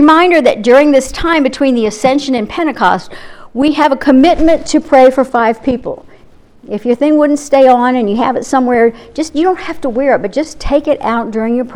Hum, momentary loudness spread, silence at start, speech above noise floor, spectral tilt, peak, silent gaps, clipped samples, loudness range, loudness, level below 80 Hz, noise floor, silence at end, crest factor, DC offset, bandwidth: none; 11 LU; 0 s; 29 dB; -4.5 dB/octave; 0 dBFS; none; 0.3%; 3 LU; -11 LUFS; -34 dBFS; -40 dBFS; 0 s; 10 dB; under 0.1%; 12.5 kHz